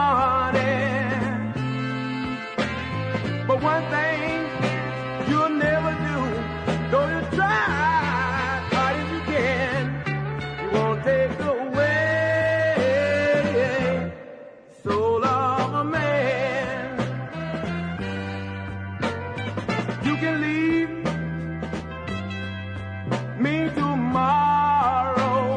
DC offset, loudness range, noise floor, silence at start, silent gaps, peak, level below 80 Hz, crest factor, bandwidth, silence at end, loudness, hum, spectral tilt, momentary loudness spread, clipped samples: under 0.1%; 5 LU; -44 dBFS; 0 s; none; -8 dBFS; -46 dBFS; 16 dB; 10 kHz; 0 s; -24 LUFS; none; -6.5 dB/octave; 10 LU; under 0.1%